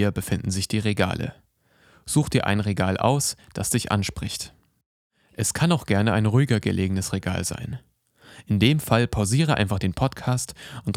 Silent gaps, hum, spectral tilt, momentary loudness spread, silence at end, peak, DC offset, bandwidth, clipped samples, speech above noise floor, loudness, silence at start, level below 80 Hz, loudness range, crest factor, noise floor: 4.86-5.10 s; none; -5 dB/octave; 12 LU; 0.05 s; -2 dBFS; under 0.1%; 16.5 kHz; under 0.1%; 36 dB; -24 LUFS; 0 s; -48 dBFS; 1 LU; 20 dB; -59 dBFS